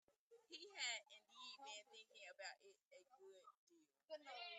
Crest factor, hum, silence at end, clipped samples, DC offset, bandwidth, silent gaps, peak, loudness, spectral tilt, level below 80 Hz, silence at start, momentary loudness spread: 22 dB; none; 0 s; under 0.1%; under 0.1%; 9 kHz; 0.18-0.30 s, 2.85-2.91 s, 3.57-3.67 s; -36 dBFS; -54 LUFS; 2.5 dB/octave; under -90 dBFS; 0.1 s; 20 LU